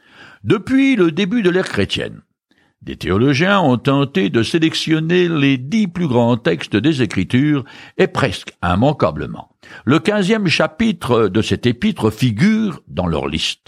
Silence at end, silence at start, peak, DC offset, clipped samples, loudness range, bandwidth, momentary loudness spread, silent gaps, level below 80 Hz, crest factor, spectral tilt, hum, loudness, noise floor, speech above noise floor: 0.15 s; 0.2 s; -2 dBFS; under 0.1%; under 0.1%; 2 LU; 15 kHz; 8 LU; none; -44 dBFS; 14 dB; -6 dB/octave; none; -16 LUFS; -60 dBFS; 44 dB